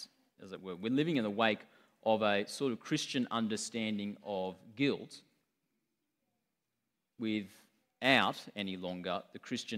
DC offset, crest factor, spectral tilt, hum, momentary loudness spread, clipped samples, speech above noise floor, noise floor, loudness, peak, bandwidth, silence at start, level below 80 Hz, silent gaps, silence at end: under 0.1%; 26 dB; -4.5 dB/octave; none; 13 LU; under 0.1%; 52 dB; -87 dBFS; -35 LUFS; -10 dBFS; 15.5 kHz; 0 s; -78 dBFS; none; 0 s